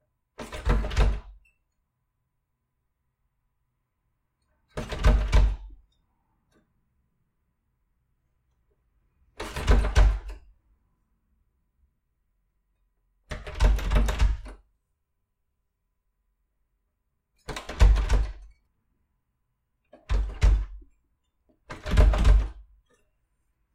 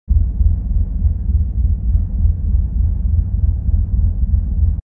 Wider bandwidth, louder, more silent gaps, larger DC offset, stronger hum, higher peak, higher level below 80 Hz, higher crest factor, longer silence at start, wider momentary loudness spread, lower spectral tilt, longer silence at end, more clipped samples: first, 10 kHz vs 1.1 kHz; second, -26 LUFS vs -19 LUFS; neither; neither; neither; second, -8 dBFS vs -2 dBFS; second, -28 dBFS vs -16 dBFS; first, 20 dB vs 12 dB; first, 0.4 s vs 0.1 s; first, 18 LU vs 2 LU; second, -6 dB/octave vs -14 dB/octave; first, 1.15 s vs 0.05 s; neither